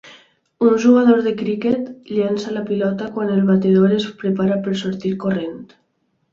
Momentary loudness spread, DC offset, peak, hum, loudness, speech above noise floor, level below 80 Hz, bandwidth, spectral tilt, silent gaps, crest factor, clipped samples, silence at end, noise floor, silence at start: 10 LU; under 0.1%; -2 dBFS; none; -18 LUFS; 50 dB; -58 dBFS; 7.4 kHz; -7.5 dB/octave; none; 16 dB; under 0.1%; 0.7 s; -67 dBFS; 0.05 s